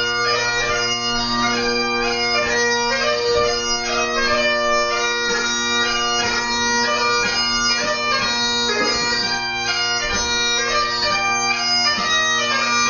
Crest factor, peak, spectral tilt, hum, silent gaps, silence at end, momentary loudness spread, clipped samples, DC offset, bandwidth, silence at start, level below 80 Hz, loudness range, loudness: 14 dB; -6 dBFS; -1 dB/octave; none; none; 0 s; 2 LU; under 0.1%; under 0.1%; 7.4 kHz; 0 s; -40 dBFS; 1 LU; -17 LUFS